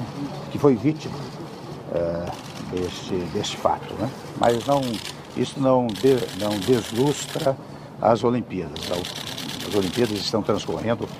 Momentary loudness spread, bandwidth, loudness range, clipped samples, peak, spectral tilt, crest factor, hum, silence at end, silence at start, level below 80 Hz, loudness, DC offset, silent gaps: 12 LU; 15.5 kHz; 4 LU; under 0.1%; -4 dBFS; -5.5 dB/octave; 20 dB; none; 0 s; 0 s; -52 dBFS; -24 LUFS; under 0.1%; none